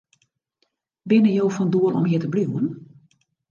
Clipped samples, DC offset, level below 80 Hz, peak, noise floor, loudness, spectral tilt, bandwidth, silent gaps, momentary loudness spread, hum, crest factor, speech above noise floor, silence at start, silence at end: under 0.1%; under 0.1%; -70 dBFS; -6 dBFS; -72 dBFS; -21 LUFS; -8 dB/octave; 7.2 kHz; none; 11 LU; none; 16 dB; 52 dB; 1.05 s; 0.65 s